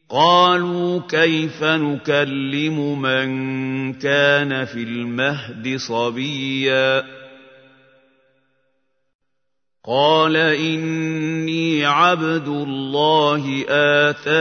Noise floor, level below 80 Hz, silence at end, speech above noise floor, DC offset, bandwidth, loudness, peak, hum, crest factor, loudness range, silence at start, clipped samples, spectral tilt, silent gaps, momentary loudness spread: -80 dBFS; -68 dBFS; 0 s; 62 dB; under 0.1%; 6.6 kHz; -18 LUFS; -2 dBFS; none; 18 dB; 6 LU; 0.1 s; under 0.1%; -5.5 dB/octave; 9.15-9.19 s; 9 LU